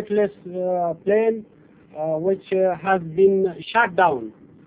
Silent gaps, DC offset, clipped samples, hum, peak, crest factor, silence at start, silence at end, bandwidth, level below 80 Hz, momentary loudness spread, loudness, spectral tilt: none; under 0.1%; under 0.1%; none; -4 dBFS; 18 dB; 0 s; 0.35 s; 4 kHz; -62 dBFS; 12 LU; -21 LUFS; -10 dB/octave